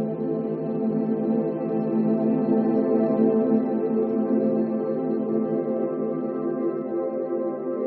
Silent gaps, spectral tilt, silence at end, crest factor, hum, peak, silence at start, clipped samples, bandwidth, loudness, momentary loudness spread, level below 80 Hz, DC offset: none; -10.5 dB/octave; 0 s; 14 dB; none; -10 dBFS; 0 s; under 0.1%; 4.2 kHz; -24 LUFS; 6 LU; -74 dBFS; under 0.1%